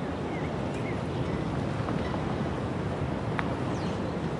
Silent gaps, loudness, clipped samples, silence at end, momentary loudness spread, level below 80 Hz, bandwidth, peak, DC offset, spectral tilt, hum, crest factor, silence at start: none; -31 LUFS; under 0.1%; 0 s; 1 LU; -46 dBFS; 11.5 kHz; -10 dBFS; under 0.1%; -7.5 dB/octave; none; 22 dB; 0 s